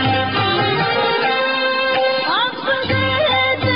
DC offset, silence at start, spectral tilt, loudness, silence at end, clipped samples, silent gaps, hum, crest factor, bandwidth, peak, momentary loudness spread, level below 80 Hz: 0.4%; 0 s; -8 dB/octave; -16 LUFS; 0 s; under 0.1%; none; none; 10 dB; 5.8 kHz; -8 dBFS; 2 LU; -48 dBFS